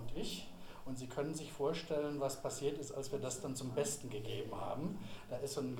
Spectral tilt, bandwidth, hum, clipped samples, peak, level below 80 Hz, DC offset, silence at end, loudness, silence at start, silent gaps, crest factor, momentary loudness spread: -4.5 dB/octave; 19 kHz; none; under 0.1%; -24 dBFS; -60 dBFS; under 0.1%; 0 s; -42 LUFS; 0 s; none; 16 dB; 9 LU